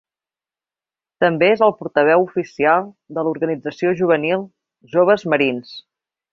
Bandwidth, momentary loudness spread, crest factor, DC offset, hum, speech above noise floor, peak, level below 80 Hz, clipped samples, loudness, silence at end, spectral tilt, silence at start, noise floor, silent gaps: 7 kHz; 11 LU; 18 dB; under 0.1%; none; over 73 dB; -2 dBFS; -64 dBFS; under 0.1%; -18 LUFS; 0.55 s; -7 dB/octave; 1.2 s; under -90 dBFS; none